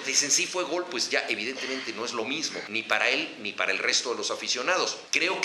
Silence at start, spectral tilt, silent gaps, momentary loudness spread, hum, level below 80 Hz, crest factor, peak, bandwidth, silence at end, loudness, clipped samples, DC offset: 0 s; 0 dB/octave; none; 8 LU; none; -82 dBFS; 22 dB; -6 dBFS; 14 kHz; 0 s; -26 LUFS; under 0.1%; under 0.1%